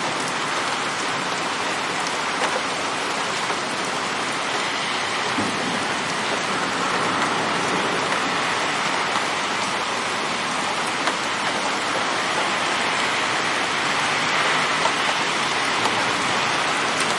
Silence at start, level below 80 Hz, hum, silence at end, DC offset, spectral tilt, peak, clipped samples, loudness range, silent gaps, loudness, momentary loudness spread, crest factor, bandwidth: 0 s; -62 dBFS; none; 0 s; under 0.1%; -2 dB/octave; -4 dBFS; under 0.1%; 3 LU; none; -21 LUFS; 3 LU; 18 dB; 11.5 kHz